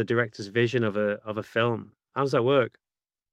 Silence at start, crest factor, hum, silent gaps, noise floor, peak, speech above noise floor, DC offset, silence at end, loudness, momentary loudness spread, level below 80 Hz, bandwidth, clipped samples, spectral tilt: 0 s; 18 dB; none; none; under -90 dBFS; -8 dBFS; over 64 dB; under 0.1%; 0.65 s; -26 LUFS; 10 LU; -72 dBFS; 10.5 kHz; under 0.1%; -6.5 dB/octave